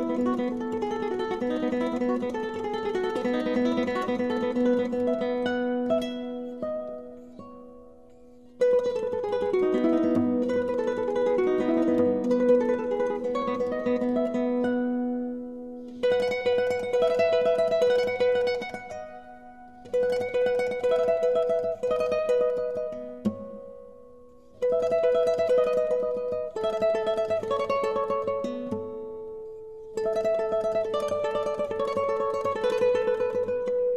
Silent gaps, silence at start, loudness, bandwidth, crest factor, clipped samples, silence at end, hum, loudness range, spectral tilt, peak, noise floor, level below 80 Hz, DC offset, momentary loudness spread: none; 0 s; -26 LUFS; 10 kHz; 16 dB; under 0.1%; 0 s; none; 5 LU; -6 dB/octave; -10 dBFS; -52 dBFS; -60 dBFS; 0.2%; 13 LU